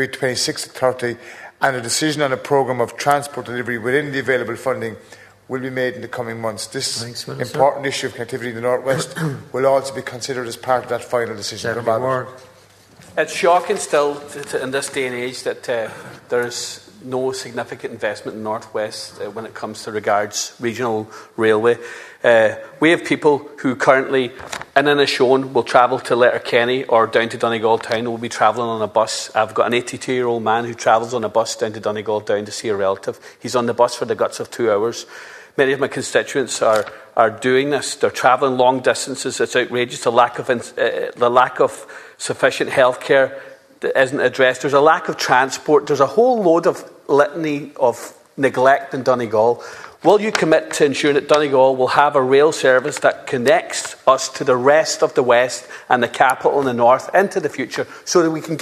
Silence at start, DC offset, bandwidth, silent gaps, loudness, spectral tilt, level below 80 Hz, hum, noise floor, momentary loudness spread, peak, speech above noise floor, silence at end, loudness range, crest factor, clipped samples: 0 s; under 0.1%; 14 kHz; none; -18 LUFS; -4 dB/octave; -64 dBFS; none; -48 dBFS; 12 LU; 0 dBFS; 30 dB; 0 s; 7 LU; 18 dB; under 0.1%